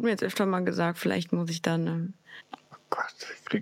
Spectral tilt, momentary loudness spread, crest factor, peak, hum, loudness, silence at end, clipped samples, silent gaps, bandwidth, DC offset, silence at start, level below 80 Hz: -6 dB/octave; 19 LU; 20 dB; -10 dBFS; none; -29 LUFS; 0 s; under 0.1%; none; 16 kHz; under 0.1%; 0 s; -78 dBFS